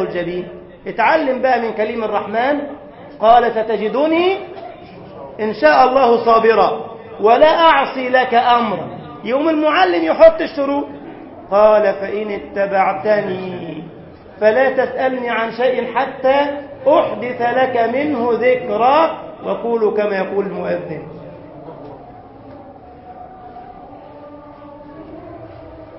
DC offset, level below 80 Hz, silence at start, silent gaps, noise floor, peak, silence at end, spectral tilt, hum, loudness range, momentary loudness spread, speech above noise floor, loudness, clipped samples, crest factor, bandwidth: under 0.1%; -52 dBFS; 0 s; none; -38 dBFS; 0 dBFS; 0 s; -9 dB/octave; none; 11 LU; 24 LU; 23 dB; -15 LUFS; under 0.1%; 16 dB; 5.8 kHz